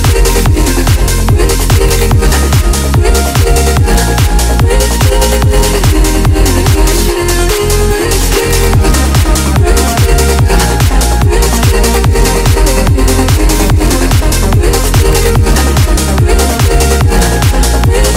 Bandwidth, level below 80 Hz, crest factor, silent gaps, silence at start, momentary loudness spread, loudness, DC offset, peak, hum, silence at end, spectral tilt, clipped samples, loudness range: 16.5 kHz; -10 dBFS; 8 dB; none; 0 s; 1 LU; -9 LUFS; under 0.1%; 0 dBFS; none; 0 s; -4.5 dB/octave; under 0.1%; 1 LU